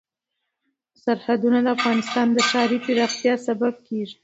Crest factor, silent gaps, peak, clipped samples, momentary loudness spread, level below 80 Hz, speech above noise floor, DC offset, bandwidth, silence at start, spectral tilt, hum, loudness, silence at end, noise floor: 16 dB; none; -6 dBFS; under 0.1%; 7 LU; -72 dBFS; 59 dB; under 0.1%; 8 kHz; 1.05 s; -3.5 dB/octave; none; -21 LUFS; 0.1 s; -80 dBFS